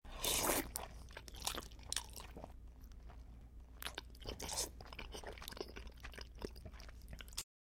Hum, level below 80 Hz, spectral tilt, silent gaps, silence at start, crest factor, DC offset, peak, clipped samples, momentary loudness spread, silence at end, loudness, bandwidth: none; -54 dBFS; -2 dB/octave; none; 0.05 s; 30 dB; under 0.1%; -16 dBFS; under 0.1%; 20 LU; 0.2 s; -44 LUFS; 16.5 kHz